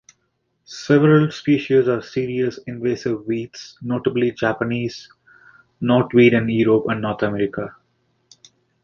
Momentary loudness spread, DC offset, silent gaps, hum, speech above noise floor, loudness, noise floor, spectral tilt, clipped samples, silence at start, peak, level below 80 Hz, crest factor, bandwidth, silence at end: 15 LU; under 0.1%; none; none; 51 dB; -19 LUFS; -70 dBFS; -7.5 dB/octave; under 0.1%; 0.7 s; -2 dBFS; -56 dBFS; 18 dB; 7.4 kHz; 1.15 s